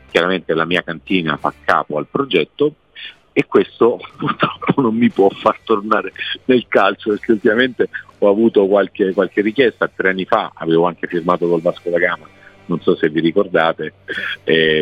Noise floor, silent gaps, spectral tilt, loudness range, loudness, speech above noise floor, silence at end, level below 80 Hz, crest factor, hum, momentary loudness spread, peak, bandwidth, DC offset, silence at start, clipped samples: -37 dBFS; none; -7 dB/octave; 3 LU; -17 LUFS; 21 dB; 0 s; -56 dBFS; 16 dB; none; 8 LU; 0 dBFS; 8.8 kHz; under 0.1%; 0.15 s; under 0.1%